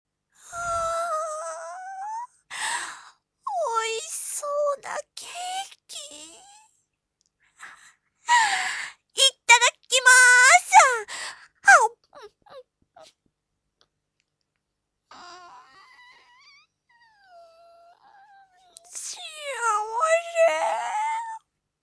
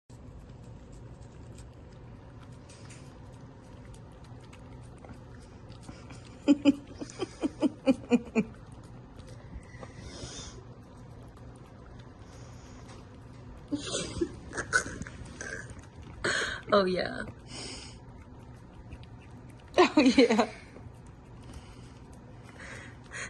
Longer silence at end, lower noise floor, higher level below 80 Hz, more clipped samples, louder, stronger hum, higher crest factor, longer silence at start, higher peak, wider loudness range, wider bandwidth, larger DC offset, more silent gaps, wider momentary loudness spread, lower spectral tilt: first, 0.45 s vs 0 s; first, -81 dBFS vs -49 dBFS; second, -66 dBFS vs -54 dBFS; neither; first, -20 LUFS vs -30 LUFS; first, 50 Hz at -80 dBFS vs none; about the same, 22 dB vs 26 dB; first, 0.5 s vs 0.1 s; first, -2 dBFS vs -8 dBFS; second, 17 LU vs 20 LU; about the same, 11 kHz vs 11.5 kHz; neither; neither; about the same, 23 LU vs 24 LU; second, 2.5 dB/octave vs -4.5 dB/octave